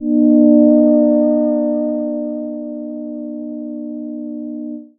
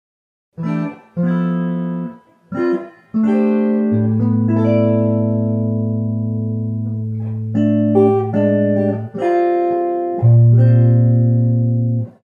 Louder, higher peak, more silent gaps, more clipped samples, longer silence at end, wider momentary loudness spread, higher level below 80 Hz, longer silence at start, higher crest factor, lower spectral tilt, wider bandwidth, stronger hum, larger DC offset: about the same, -14 LUFS vs -16 LUFS; about the same, 0 dBFS vs 0 dBFS; neither; neither; about the same, 0.15 s vs 0.15 s; first, 16 LU vs 11 LU; first, -58 dBFS vs -64 dBFS; second, 0 s vs 0.6 s; about the same, 14 dB vs 14 dB; first, -14 dB/octave vs -11.5 dB/octave; second, 1.9 kHz vs 3.3 kHz; neither; neither